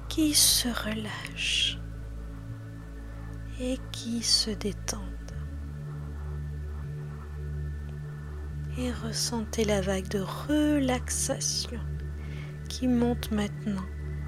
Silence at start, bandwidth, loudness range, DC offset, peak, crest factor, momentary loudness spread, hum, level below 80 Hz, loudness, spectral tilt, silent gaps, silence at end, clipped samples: 0 s; 16 kHz; 9 LU; under 0.1%; -8 dBFS; 22 dB; 16 LU; none; -40 dBFS; -29 LUFS; -3.5 dB/octave; none; 0 s; under 0.1%